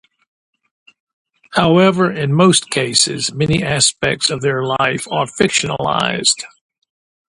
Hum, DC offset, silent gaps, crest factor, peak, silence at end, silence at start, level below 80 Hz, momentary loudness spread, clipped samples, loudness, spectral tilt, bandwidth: none; under 0.1%; none; 16 dB; 0 dBFS; 0.9 s; 1.5 s; -48 dBFS; 7 LU; under 0.1%; -15 LUFS; -3.5 dB/octave; 11.5 kHz